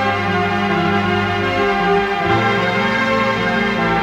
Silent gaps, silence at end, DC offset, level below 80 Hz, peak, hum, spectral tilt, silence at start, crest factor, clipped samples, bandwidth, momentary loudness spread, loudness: none; 0 s; under 0.1%; -42 dBFS; -2 dBFS; none; -6 dB/octave; 0 s; 14 dB; under 0.1%; 16 kHz; 2 LU; -16 LUFS